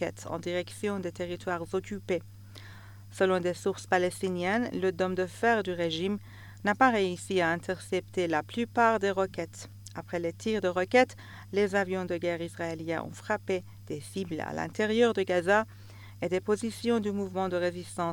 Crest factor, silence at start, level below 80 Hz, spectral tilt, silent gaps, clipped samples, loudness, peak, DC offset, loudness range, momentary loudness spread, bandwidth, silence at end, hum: 22 dB; 0 s; -64 dBFS; -5 dB/octave; none; under 0.1%; -30 LUFS; -8 dBFS; under 0.1%; 4 LU; 14 LU; 18.5 kHz; 0 s; none